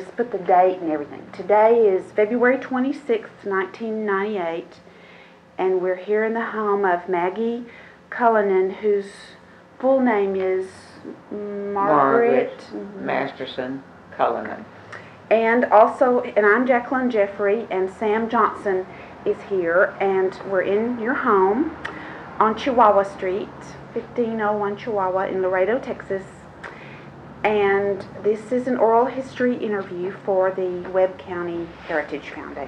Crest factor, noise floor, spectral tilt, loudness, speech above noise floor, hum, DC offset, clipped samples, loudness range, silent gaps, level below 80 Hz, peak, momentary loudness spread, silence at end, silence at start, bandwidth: 20 dB; -47 dBFS; -7 dB/octave; -21 LUFS; 26 dB; none; under 0.1%; under 0.1%; 5 LU; none; -58 dBFS; -2 dBFS; 17 LU; 0 s; 0 s; 9.4 kHz